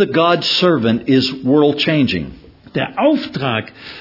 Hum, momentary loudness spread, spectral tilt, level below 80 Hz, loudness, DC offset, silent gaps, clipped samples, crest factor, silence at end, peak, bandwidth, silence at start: none; 10 LU; -6.5 dB/octave; -50 dBFS; -15 LUFS; under 0.1%; none; under 0.1%; 16 dB; 0 s; 0 dBFS; 5.8 kHz; 0 s